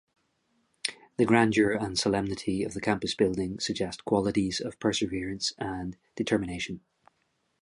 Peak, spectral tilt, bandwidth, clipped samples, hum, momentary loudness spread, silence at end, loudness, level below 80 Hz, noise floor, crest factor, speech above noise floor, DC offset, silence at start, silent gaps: -6 dBFS; -4.5 dB/octave; 11.5 kHz; under 0.1%; none; 11 LU; 0.85 s; -29 LUFS; -54 dBFS; -75 dBFS; 24 dB; 47 dB; under 0.1%; 0.85 s; none